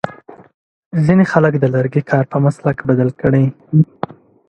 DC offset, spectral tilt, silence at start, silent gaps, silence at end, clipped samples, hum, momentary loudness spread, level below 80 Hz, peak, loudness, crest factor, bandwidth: under 0.1%; -9.5 dB/octave; 0.05 s; 0.54-0.91 s; 0.65 s; under 0.1%; none; 9 LU; -48 dBFS; 0 dBFS; -15 LUFS; 16 dB; 8.6 kHz